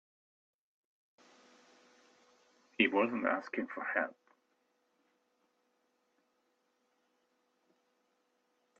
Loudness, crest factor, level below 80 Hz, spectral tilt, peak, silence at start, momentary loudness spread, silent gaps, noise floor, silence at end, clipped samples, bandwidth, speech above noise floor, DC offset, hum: -34 LUFS; 28 dB; -90 dBFS; -5.5 dB/octave; -14 dBFS; 2.8 s; 11 LU; none; -78 dBFS; 4.65 s; under 0.1%; 7.6 kHz; 45 dB; under 0.1%; none